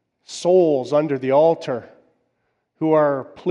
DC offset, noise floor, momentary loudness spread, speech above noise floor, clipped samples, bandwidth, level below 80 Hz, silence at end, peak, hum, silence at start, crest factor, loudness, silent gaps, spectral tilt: under 0.1%; -71 dBFS; 11 LU; 53 dB; under 0.1%; 11 kHz; -70 dBFS; 0 s; -6 dBFS; none; 0.3 s; 14 dB; -19 LUFS; none; -6.5 dB/octave